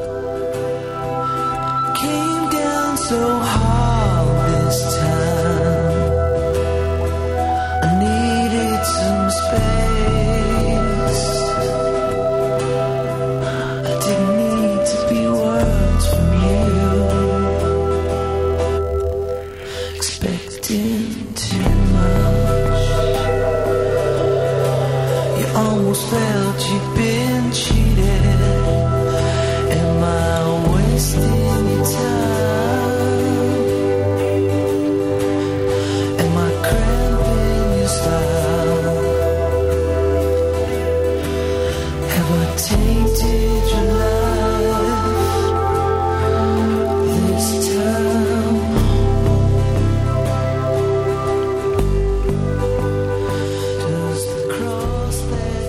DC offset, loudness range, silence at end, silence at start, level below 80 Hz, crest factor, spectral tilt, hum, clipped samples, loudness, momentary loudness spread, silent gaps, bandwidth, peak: under 0.1%; 2 LU; 0 s; 0 s; -24 dBFS; 14 dB; -6 dB/octave; none; under 0.1%; -18 LUFS; 4 LU; none; 16 kHz; -4 dBFS